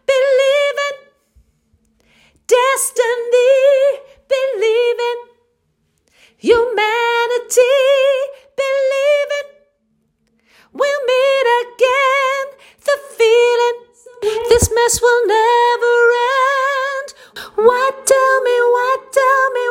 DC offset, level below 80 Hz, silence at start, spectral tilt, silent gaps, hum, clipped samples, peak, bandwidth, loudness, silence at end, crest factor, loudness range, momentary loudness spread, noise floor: under 0.1%; -44 dBFS; 0.1 s; -2 dB/octave; none; none; under 0.1%; 0 dBFS; 16.5 kHz; -14 LUFS; 0 s; 14 dB; 4 LU; 11 LU; -64 dBFS